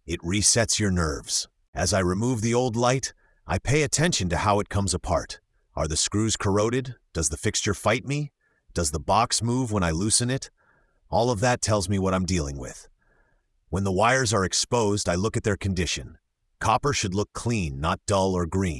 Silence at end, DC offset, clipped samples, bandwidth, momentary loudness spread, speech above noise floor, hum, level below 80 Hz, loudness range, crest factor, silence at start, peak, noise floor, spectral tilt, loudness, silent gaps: 0 s; under 0.1%; under 0.1%; 12 kHz; 9 LU; 41 dB; none; -44 dBFS; 2 LU; 20 dB; 0.05 s; -6 dBFS; -66 dBFS; -4 dB/octave; -24 LUFS; 1.68-1.73 s